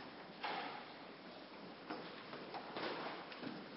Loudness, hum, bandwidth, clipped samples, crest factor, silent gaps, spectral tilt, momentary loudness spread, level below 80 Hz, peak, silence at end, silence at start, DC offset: -48 LUFS; none; 5.6 kHz; under 0.1%; 20 dB; none; -2 dB/octave; 9 LU; -82 dBFS; -30 dBFS; 0 s; 0 s; under 0.1%